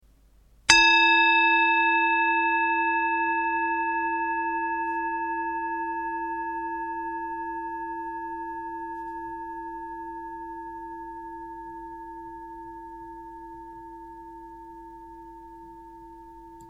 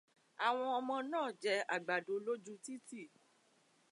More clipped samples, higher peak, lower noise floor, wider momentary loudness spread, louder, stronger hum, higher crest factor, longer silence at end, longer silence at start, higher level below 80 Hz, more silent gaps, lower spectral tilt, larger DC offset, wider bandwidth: neither; first, 0 dBFS vs -20 dBFS; second, -57 dBFS vs -73 dBFS; first, 26 LU vs 14 LU; first, -24 LUFS vs -39 LUFS; neither; first, 28 dB vs 20 dB; second, 0 s vs 0.85 s; first, 0.7 s vs 0.4 s; first, -56 dBFS vs under -90 dBFS; neither; second, -1 dB/octave vs -3 dB/octave; neither; about the same, 11.5 kHz vs 11.5 kHz